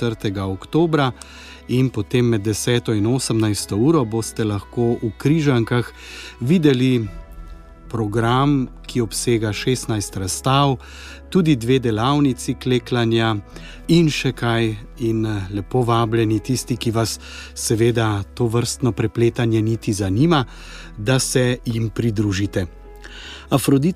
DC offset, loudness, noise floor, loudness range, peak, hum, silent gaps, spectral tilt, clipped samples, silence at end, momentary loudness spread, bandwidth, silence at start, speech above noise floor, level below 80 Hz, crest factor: under 0.1%; -20 LUFS; -38 dBFS; 2 LU; -2 dBFS; none; none; -5.5 dB/octave; under 0.1%; 0 s; 11 LU; 15.5 kHz; 0 s; 19 dB; -40 dBFS; 16 dB